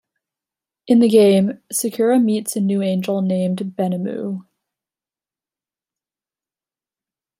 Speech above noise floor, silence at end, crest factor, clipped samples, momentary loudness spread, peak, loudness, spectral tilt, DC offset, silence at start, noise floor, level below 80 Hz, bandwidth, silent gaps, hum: over 73 dB; 3 s; 18 dB; under 0.1%; 12 LU; -2 dBFS; -18 LUFS; -6 dB/octave; under 0.1%; 0.85 s; under -90 dBFS; -70 dBFS; 16 kHz; none; none